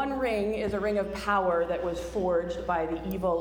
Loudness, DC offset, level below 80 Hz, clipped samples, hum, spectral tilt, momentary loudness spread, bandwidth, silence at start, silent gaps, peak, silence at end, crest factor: -29 LUFS; under 0.1%; -46 dBFS; under 0.1%; none; -6 dB/octave; 4 LU; over 20 kHz; 0 s; none; -14 dBFS; 0 s; 14 dB